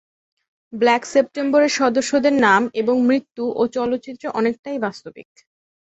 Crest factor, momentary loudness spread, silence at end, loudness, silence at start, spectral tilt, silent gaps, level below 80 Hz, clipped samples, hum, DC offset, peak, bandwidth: 18 dB; 10 LU; 0.75 s; -19 LUFS; 0.7 s; -4 dB/octave; 4.59-4.63 s; -64 dBFS; under 0.1%; none; under 0.1%; -2 dBFS; 8.2 kHz